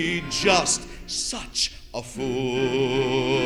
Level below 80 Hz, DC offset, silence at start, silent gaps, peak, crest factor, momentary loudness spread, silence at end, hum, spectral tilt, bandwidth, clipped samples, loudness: -44 dBFS; under 0.1%; 0 s; none; -4 dBFS; 20 dB; 11 LU; 0 s; none; -3 dB/octave; 14.5 kHz; under 0.1%; -24 LUFS